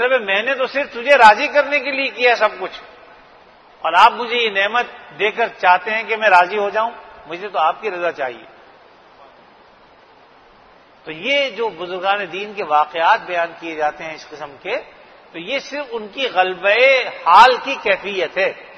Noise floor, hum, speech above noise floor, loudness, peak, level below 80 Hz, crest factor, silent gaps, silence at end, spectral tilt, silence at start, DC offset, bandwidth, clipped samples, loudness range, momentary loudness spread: -48 dBFS; none; 31 dB; -16 LUFS; 0 dBFS; -60 dBFS; 18 dB; none; 0.05 s; -2.5 dB/octave; 0 s; under 0.1%; 12 kHz; under 0.1%; 10 LU; 15 LU